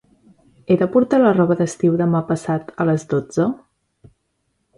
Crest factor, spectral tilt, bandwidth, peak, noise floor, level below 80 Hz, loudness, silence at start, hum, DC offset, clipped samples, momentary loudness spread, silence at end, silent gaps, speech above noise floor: 16 dB; -8 dB/octave; 11.5 kHz; -4 dBFS; -70 dBFS; -58 dBFS; -18 LUFS; 0.7 s; none; under 0.1%; under 0.1%; 7 LU; 1.2 s; none; 53 dB